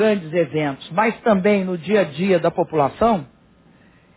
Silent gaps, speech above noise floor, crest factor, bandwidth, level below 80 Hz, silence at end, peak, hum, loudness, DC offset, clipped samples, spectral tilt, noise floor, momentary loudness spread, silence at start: none; 34 dB; 16 dB; 4 kHz; -52 dBFS; 0.9 s; -4 dBFS; none; -19 LUFS; under 0.1%; under 0.1%; -10.5 dB/octave; -52 dBFS; 4 LU; 0 s